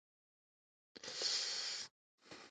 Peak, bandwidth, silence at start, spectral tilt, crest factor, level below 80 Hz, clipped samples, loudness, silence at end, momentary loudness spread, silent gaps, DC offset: -26 dBFS; 9.4 kHz; 0.95 s; 1.5 dB/octave; 20 dB; under -90 dBFS; under 0.1%; -39 LUFS; 0 s; 19 LU; 1.91-2.18 s; under 0.1%